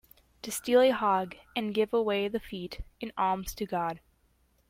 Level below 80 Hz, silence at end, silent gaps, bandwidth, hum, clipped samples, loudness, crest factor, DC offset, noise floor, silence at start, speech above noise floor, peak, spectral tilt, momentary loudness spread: -54 dBFS; 0.7 s; none; 16.5 kHz; none; under 0.1%; -29 LUFS; 18 dB; under 0.1%; -68 dBFS; 0.45 s; 39 dB; -12 dBFS; -4.5 dB/octave; 16 LU